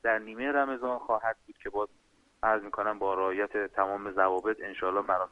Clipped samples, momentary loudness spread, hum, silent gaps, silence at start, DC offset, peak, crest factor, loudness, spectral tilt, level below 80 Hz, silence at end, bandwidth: under 0.1%; 7 LU; none; none; 0.05 s; under 0.1%; -10 dBFS; 20 dB; -31 LUFS; -6 dB/octave; -64 dBFS; 0.05 s; 9.2 kHz